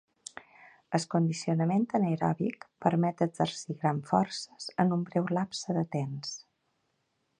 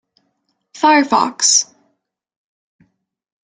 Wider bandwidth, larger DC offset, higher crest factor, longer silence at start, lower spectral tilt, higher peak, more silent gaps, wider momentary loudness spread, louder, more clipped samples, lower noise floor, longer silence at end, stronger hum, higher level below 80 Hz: about the same, 10.5 kHz vs 11 kHz; neither; about the same, 22 dB vs 18 dB; first, 0.9 s vs 0.75 s; first, -6 dB/octave vs -0.5 dB/octave; second, -8 dBFS vs 0 dBFS; neither; first, 11 LU vs 5 LU; second, -30 LUFS vs -13 LUFS; neither; first, -77 dBFS vs -69 dBFS; second, 1 s vs 1.95 s; neither; about the same, -70 dBFS vs -70 dBFS